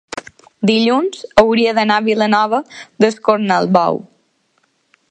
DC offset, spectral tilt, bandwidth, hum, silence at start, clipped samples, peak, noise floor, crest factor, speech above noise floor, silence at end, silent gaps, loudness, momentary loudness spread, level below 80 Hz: under 0.1%; -5.5 dB/octave; 9.2 kHz; none; 0.15 s; under 0.1%; 0 dBFS; -62 dBFS; 16 dB; 48 dB; 1.15 s; none; -14 LUFS; 9 LU; -50 dBFS